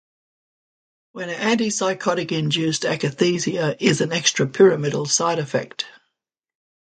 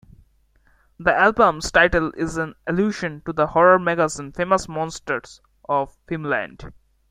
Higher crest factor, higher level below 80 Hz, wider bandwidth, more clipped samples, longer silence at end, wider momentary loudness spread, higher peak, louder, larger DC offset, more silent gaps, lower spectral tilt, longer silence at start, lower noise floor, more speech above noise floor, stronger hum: about the same, 20 dB vs 20 dB; second, -64 dBFS vs -44 dBFS; second, 9.4 kHz vs 14.5 kHz; neither; first, 1.1 s vs 0.4 s; second, 10 LU vs 13 LU; about the same, -2 dBFS vs -2 dBFS; about the same, -20 LUFS vs -20 LUFS; neither; neither; about the same, -4 dB/octave vs -5 dB/octave; first, 1.15 s vs 1 s; first, -81 dBFS vs -59 dBFS; first, 60 dB vs 39 dB; neither